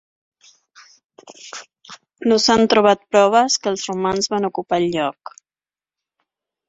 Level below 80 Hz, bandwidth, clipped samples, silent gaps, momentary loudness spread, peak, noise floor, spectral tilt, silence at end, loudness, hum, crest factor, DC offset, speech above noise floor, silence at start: -58 dBFS; 8 kHz; under 0.1%; none; 21 LU; 0 dBFS; under -90 dBFS; -3.5 dB/octave; 1.6 s; -17 LUFS; none; 20 dB; under 0.1%; over 73 dB; 1.45 s